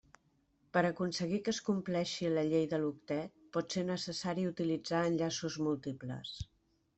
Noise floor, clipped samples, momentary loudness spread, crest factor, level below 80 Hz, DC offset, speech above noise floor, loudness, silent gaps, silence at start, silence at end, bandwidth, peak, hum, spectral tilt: -74 dBFS; under 0.1%; 10 LU; 20 dB; -66 dBFS; under 0.1%; 39 dB; -36 LUFS; none; 0.75 s; 0.55 s; 8.2 kHz; -16 dBFS; none; -5.5 dB/octave